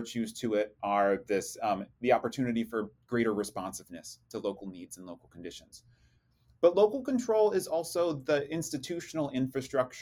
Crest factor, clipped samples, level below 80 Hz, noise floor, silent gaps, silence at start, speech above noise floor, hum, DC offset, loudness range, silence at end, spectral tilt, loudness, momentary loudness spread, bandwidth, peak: 20 dB; under 0.1%; -68 dBFS; -67 dBFS; none; 0 s; 36 dB; none; under 0.1%; 8 LU; 0 s; -5 dB/octave; -31 LUFS; 18 LU; 18 kHz; -12 dBFS